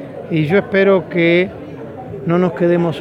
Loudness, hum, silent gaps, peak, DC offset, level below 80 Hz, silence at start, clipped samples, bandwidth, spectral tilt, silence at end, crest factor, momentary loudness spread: -15 LUFS; none; none; -2 dBFS; under 0.1%; -52 dBFS; 0 s; under 0.1%; 6.2 kHz; -8.5 dB/octave; 0 s; 14 dB; 17 LU